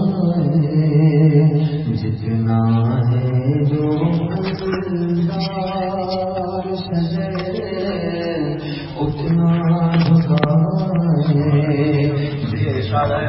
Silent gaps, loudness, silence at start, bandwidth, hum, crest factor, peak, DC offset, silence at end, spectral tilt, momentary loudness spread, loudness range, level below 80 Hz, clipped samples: none; -18 LUFS; 0 s; 5.8 kHz; none; 14 dB; -2 dBFS; under 0.1%; 0 s; -12 dB/octave; 8 LU; 6 LU; -44 dBFS; under 0.1%